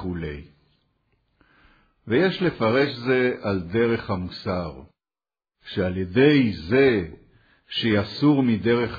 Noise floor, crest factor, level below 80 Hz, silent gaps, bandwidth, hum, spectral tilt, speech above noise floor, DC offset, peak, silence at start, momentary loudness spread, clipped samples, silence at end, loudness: under -90 dBFS; 18 dB; -50 dBFS; none; 5 kHz; none; -8.5 dB/octave; over 68 dB; under 0.1%; -6 dBFS; 0 s; 12 LU; under 0.1%; 0 s; -22 LUFS